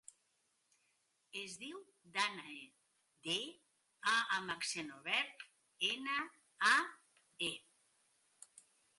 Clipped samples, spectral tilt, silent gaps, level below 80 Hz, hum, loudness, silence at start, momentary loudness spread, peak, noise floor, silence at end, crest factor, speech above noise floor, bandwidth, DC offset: under 0.1%; -1 dB/octave; none; -88 dBFS; none; -38 LUFS; 1.35 s; 17 LU; -18 dBFS; -80 dBFS; 1.4 s; 24 dB; 41 dB; 11.5 kHz; under 0.1%